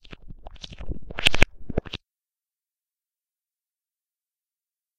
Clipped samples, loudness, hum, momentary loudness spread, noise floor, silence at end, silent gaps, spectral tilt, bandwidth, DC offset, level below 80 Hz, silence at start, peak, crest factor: under 0.1%; -24 LUFS; none; 22 LU; under -90 dBFS; 3 s; none; -3.5 dB/octave; 12 kHz; under 0.1%; -36 dBFS; 0.1 s; 0 dBFS; 28 dB